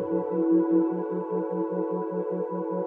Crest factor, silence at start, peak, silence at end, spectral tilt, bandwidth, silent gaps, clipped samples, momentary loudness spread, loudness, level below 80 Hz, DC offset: 14 dB; 0 s; -12 dBFS; 0 s; -12.5 dB/octave; 2.8 kHz; none; under 0.1%; 8 LU; -27 LUFS; -76 dBFS; under 0.1%